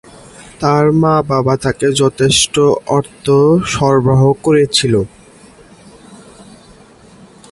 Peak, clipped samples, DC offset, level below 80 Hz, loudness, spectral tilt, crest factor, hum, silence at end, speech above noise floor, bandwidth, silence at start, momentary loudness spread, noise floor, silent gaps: 0 dBFS; under 0.1%; under 0.1%; -42 dBFS; -12 LUFS; -5 dB/octave; 14 dB; none; 1.35 s; 30 dB; 11.5 kHz; 0.4 s; 5 LU; -42 dBFS; none